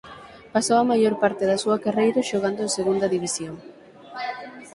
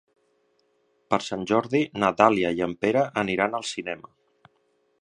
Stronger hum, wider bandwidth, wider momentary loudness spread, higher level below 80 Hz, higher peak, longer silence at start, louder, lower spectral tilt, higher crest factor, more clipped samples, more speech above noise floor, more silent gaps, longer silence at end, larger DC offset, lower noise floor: neither; about the same, 11.5 kHz vs 10.5 kHz; first, 17 LU vs 11 LU; about the same, -62 dBFS vs -62 dBFS; second, -6 dBFS vs -2 dBFS; second, 0.05 s vs 1.1 s; about the same, -23 LUFS vs -24 LUFS; about the same, -4 dB/octave vs -5 dB/octave; second, 18 dB vs 24 dB; neither; second, 22 dB vs 45 dB; neither; second, 0.05 s vs 1.05 s; neither; second, -44 dBFS vs -69 dBFS